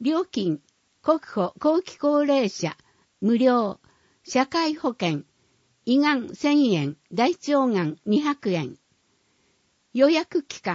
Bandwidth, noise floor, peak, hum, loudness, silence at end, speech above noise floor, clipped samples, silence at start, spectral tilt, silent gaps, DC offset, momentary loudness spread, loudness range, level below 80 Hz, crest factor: 7.8 kHz; -67 dBFS; -6 dBFS; none; -24 LUFS; 0 s; 44 dB; under 0.1%; 0 s; -5.5 dB/octave; none; under 0.1%; 10 LU; 2 LU; -70 dBFS; 18 dB